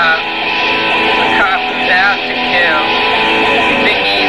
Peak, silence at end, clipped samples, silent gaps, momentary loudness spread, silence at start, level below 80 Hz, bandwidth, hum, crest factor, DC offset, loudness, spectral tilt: -2 dBFS; 0 s; under 0.1%; none; 3 LU; 0 s; -42 dBFS; 16 kHz; none; 10 dB; 0.7%; -10 LUFS; -3.5 dB/octave